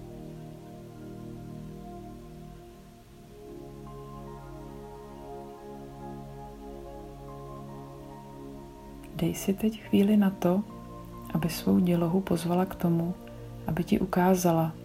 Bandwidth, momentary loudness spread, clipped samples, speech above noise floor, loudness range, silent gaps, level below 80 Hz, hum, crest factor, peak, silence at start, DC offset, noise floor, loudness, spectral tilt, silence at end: 16 kHz; 21 LU; under 0.1%; 24 dB; 18 LU; none; -52 dBFS; none; 20 dB; -12 dBFS; 0 s; under 0.1%; -50 dBFS; -27 LUFS; -7 dB/octave; 0 s